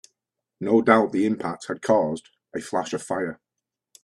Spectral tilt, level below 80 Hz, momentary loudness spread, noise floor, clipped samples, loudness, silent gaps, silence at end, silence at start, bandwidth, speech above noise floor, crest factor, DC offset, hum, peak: -5.5 dB/octave; -66 dBFS; 15 LU; -85 dBFS; under 0.1%; -23 LUFS; none; 0.7 s; 0.6 s; 12 kHz; 63 dB; 22 dB; under 0.1%; none; -2 dBFS